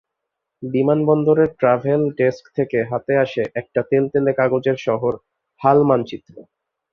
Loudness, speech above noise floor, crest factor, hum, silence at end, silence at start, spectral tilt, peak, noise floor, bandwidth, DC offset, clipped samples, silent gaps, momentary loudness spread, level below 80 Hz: -18 LUFS; 62 dB; 18 dB; none; 0.5 s; 0.6 s; -8.5 dB/octave; -2 dBFS; -80 dBFS; 6.6 kHz; under 0.1%; under 0.1%; none; 9 LU; -58 dBFS